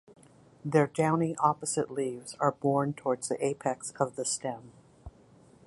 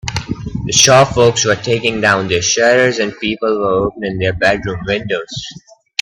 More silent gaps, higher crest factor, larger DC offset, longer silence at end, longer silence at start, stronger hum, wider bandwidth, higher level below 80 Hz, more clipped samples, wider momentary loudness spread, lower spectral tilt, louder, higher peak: neither; first, 20 dB vs 14 dB; neither; about the same, 0.55 s vs 0.45 s; first, 0.65 s vs 0.05 s; neither; second, 11.5 kHz vs 16.5 kHz; second, -64 dBFS vs -40 dBFS; neither; second, 7 LU vs 14 LU; first, -5 dB/octave vs -3 dB/octave; second, -30 LUFS vs -13 LUFS; second, -10 dBFS vs 0 dBFS